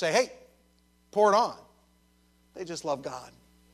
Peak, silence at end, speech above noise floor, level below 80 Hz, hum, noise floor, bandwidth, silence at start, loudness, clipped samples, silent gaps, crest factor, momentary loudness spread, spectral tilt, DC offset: -10 dBFS; 0.45 s; 38 dB; -68 dBFS; none; -65 dBFS; 14 kHz; 0 s; -28 LUFS; under 0.1%; none; 20 dB; 20 LU; -3.5 dB/octave; under 0.1%